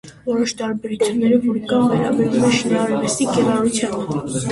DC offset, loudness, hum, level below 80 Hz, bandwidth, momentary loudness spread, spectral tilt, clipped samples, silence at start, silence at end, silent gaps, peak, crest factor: under 0.1%; -18 LUFS; none; -52 dBFS; 11.5 kHz; 7 LU; -5 dB/octave; under 0.1%; 0.05 s; 0 s; none; -4 dBFS; 14 dB